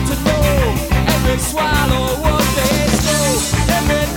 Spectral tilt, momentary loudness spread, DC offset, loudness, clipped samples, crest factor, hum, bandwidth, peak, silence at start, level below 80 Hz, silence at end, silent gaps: -4.5 dB/octave; 2 LU; under 0.1%; -15 LUFS; under 0.1%; 14 dB; none; 19 kHz; 0 dBFS; 0 s; -22 dBFS; 0 s; none